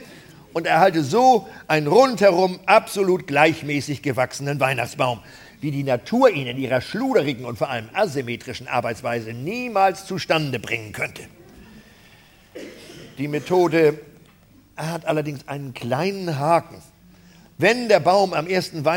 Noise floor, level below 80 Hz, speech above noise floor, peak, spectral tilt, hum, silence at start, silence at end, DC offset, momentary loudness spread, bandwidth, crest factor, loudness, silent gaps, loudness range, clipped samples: -52 dBFS; -58 dBFS; 32 dB; 0 dBFS; -5.5 dB/octave; none; 0 s; 0 s; under 0.1%; 14 LU; 17.5 kHz; 20 dB; -21 LUFS; none; 8 LU; under 0.1%